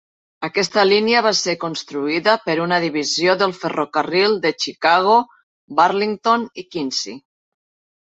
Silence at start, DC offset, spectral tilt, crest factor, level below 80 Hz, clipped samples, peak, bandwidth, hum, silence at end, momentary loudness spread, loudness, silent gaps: 0.4 s; under 0.1%; -3.5 dB/octave; 18 dB; -66 dBFS; under 0.1%; -2 dBFS; 8.2 kHz; none; 0.8 s; 10 LU; -18 LUFS; 5.43-5.68 s